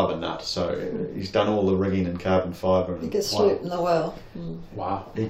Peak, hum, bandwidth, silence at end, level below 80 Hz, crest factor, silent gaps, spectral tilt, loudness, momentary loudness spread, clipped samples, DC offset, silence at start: -8 dBFS; none; 16 kHz; 0 s; -52 dBFS; 16 dB; none; -6 dB/octave; -25 LUFS; 10 LU; under 0.1%; under 0.1%; 0 s